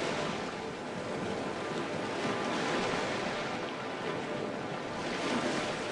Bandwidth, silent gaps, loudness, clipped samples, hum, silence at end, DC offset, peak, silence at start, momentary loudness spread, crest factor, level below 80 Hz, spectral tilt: 11.5 kHz; none; -34 LUFS; under 0.1%; none; 0 s; under 0.1%; -18 dBFS; 0 s; 6 LU; 16 dB; -64 dBFS; -4.5 dB/octave